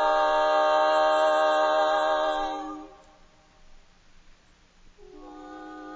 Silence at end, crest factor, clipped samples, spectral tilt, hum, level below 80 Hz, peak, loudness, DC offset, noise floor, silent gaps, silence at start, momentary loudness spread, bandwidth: 0 s; 16 dB; under 0.1%; -2.5 dB/octave; none; -58 dBFS; -10 dBFS; -23 LUFS; under 0.1%; -58 dBFS; none; 0 s; 21 LU; 8 kHz